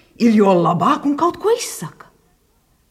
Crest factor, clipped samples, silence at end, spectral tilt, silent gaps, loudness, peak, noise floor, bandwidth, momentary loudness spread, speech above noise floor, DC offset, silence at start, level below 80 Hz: 16 dB; under 0.1%; 1 s; -6 dB/octave; none; -16 LUFS; -2 dBFS; -59 dBFS; 15.5 kHz; 14 LU; 43 dB; under 0.1%; 0.2 s; -60 dBFS